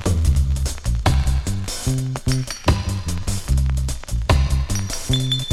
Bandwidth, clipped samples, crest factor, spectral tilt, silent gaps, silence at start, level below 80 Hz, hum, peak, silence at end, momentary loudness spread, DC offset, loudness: 15 kHz; under 0.1%; 18 dB; -5 dB/octave; none; 0 s; -22 dBFS; none; 0 dBFS; 0 s; 6 LU; under 0.1%; -22 LUFS